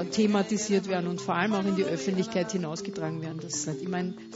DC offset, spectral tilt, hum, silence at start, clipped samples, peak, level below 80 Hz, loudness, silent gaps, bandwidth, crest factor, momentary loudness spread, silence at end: under 0.1%; -5 dB/octave; none; 0 s; under 0.1%; -12 dBFS; -68 dBFS; -29 LUFS; none; 8 kHz; 18 dB; 8 LU; 0 s